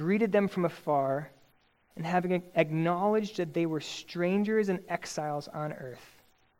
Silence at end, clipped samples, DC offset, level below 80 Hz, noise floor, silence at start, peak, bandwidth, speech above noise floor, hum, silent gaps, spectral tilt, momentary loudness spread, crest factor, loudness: 0.55 s; under 0.1%; under 0.1%; -70 dBFS; -67 dBFS; 0 s; -10 dBFS; 16.5 kHz; 37 dB; none; none; -6.5 dB/octave; 11 LU; 20 dB; -30 LUFS